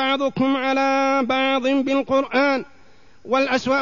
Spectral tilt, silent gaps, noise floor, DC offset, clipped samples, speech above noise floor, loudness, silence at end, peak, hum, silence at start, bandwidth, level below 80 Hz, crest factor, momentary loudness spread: -4.5 dB/octave; none; -52 dBFS; 0.5%; under 0.1%; 32 dB; -20 LUFS; 0 s; -8 dBFS; none; 0 s; 7.4 kHz; -60 dBFS; 12 dB; 3 LU